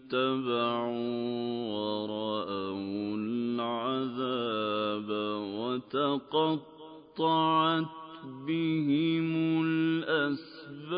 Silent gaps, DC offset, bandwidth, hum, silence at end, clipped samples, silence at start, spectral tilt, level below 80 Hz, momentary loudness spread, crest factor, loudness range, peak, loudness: none; under 0.1%; 5.2 kHz; none; 0 s; under 0.1%; 0.05 s; -10 dB/octave; -74 dBFS; 8 LU; 16 dB; 4 LU; -16 dBFS; -31 LUFS